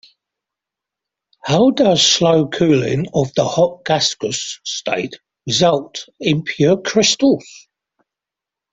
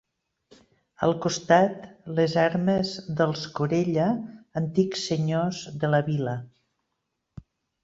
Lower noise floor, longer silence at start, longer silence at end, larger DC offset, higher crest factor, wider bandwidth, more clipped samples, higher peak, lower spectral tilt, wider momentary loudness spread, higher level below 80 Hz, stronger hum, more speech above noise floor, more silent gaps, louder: first, -86 dBFS vs -80 dBFS; first, 1.45 s vs 1 s; second, 1.15 s vs 1.35 s; neither; about the same, 16 dB vs 20 dB; about the same, 8.4 kHz vs 7.8 kHz; neither; first, -2 dBFS vs -6 dBFS; second, -4 dB/octave vs -6 dB/octave; about the same, 11 LU vs 10 LU; first, -54 dBFS vs -60 dBFS; neither; first, 70 dB vs 55 dB; neither; first, -16 LUFS vs -25 LUFS